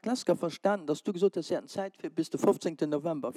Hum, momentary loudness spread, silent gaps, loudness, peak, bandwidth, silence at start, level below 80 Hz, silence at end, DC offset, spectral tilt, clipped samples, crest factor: none; 7 LU; none; -31 LUFS; -14 dBFS; 14 kHz; 0.05 s; -88 dBFS; 0.05 s; under 0.1%; -5.5 dB/octave; under 0.1%; 18 dB